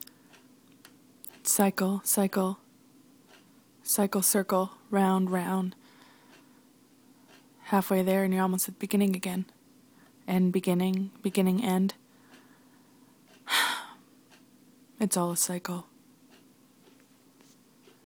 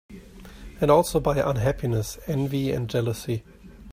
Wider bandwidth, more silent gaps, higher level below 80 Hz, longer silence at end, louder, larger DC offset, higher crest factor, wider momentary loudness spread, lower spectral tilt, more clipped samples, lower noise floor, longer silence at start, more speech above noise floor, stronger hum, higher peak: first, 19.5 kHz vs 16 kHz; neither; second, -74 dBFS vs -42 dBFS; first, 2.25 s vs 0 s; second, -28 LUFS vs -25 LUFS; neither; about the same, 22 dB vs 20 dB; about the same, 15 LU vs 13 LU; second, -4.5 dB/octave vs -6.5 dB/octave; neither; first, -60 dBFS vs -43 dBFS; first, 1.45 s vs 0.1 s; first, 33 dB vs 20 dB; neither; second, -10 dBFS vs -6 dBFS